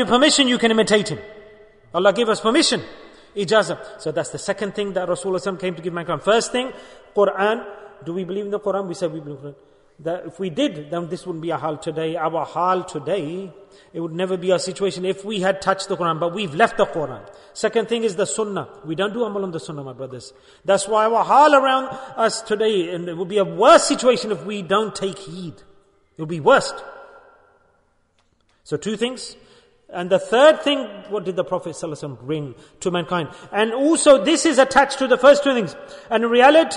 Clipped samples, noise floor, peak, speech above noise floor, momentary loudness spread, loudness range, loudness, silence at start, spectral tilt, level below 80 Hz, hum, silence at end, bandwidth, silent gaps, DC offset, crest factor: under 0.1%; -63 dBFS; -2 dBFS; 43 dB; 18 LU; 8 LU; -20 LUFS; 0 s; -4 dB/octave; -58 dBFS; none; 0 s; 11 kHz; none; under 0.1%; 18 dB